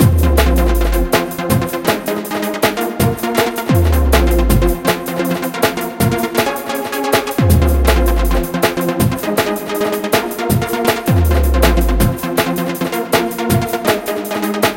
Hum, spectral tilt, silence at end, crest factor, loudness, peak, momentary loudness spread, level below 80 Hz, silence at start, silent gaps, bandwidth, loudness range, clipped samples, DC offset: none; -5.5 dB/octave; 0 s; 14 dB; -15 LUFS; 0 dBFS; 6 LU; -20 dBFS; 0 s; none; 17.5 kHz; 1 LU; under 0.1%; under 0.1%